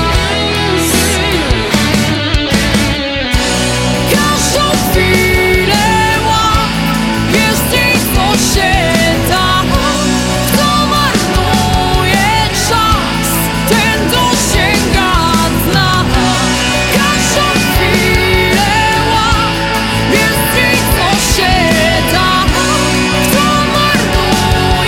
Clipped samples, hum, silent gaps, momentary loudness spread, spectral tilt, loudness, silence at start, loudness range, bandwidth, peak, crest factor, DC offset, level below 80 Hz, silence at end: under 0.1%; none; none; 3 LU; -4 dB/octave; -10 LUFS; 0 s; 1 LU; 17 kHz; 0 dBFS; 10 dB; under 0.1%; -22 dBFS; 0 s